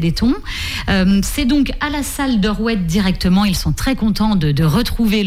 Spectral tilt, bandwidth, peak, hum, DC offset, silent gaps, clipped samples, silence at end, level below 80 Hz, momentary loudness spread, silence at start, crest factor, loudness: -5.5 dB/octave; 16 kHz; -4 dBFS; none; under 0.1%; none; under 0.1%; 0 s; -26 dBFS; 5 LU; 0 s; 10 dB; -16 LUFS